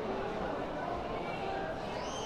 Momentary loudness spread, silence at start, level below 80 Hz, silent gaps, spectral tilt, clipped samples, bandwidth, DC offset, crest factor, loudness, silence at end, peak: 1 LU; 0 s; -52 dBFS; none; -5 dB/octave; under 0.1%; 14.5 kHz; under 0.1%; 12 dB; -37 LUFS; 0 s; -24 dBFS